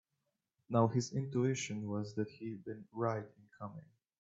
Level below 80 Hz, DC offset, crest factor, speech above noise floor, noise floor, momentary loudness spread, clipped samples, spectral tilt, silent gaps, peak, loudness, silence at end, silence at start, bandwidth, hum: -78 dBFS; under 0.1%; 22 dB; 49 dB; -86 dBFS; 17 LU; under 0.1%; -6.5 dB/octave; none; -16 dBFS; -37 LUFS; 0.35 s; 0.7 s; 8 kHz; none